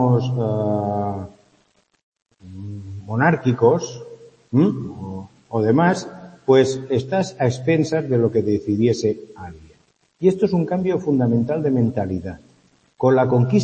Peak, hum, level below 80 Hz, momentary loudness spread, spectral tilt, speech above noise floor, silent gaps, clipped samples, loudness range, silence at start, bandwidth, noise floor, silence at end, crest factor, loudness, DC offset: -2 dBFS; none; -56 dBFS; 17 LU; -7.5 dB/octave; 43 dB; 2.03-2.12 s; under 0.1%; 4 LU; 0 s; 8.8 kHz; -62 dBFS; 0 s; 18 dB; -20 LUFS; under 0.1%